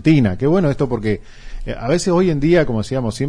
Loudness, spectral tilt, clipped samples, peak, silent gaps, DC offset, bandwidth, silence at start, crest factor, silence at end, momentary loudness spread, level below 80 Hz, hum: -17 LUFS; -7 dB/octave; under 0.1%; -2 dBFS; none; under 0.1%; 10.5 kHz; 0 s; 14 dB; 0 s; 11 LU; -32 dBFS; none